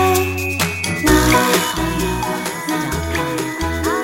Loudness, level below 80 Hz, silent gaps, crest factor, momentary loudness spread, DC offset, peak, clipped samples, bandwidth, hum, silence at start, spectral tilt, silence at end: -18 LUFS; -30 dBFS; none; 16 dB; 8 LU; under 0.1%; 0 dBFS; under 0.1%; 17 kHz; none; 0 s; -4 dB/octave; 0 s